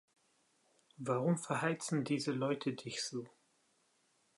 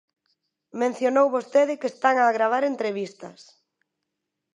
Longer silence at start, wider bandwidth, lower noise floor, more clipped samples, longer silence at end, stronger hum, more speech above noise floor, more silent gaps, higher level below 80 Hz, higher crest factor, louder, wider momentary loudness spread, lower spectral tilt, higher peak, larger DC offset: first, 1 s vs 0.75 s; about the same, 11.5 kHz vs 10.5 kHz; second, -76 dBFS vs -82 dBFS; neither; second, 1.1 s vs 1.25 s; neither; second, 39 dB vs 59 dB; neither; about the same, -84 dBFS vs -82 dBFS; about the same, 18 dB vs 20 dB; second, -37 LUFS vs -23 LUFS; second, 9 LU vs 16 LU; about the same, -5 dB/octave vs -4.5 dB/octave; second, -20 dBFS vs -6 dBFS; neither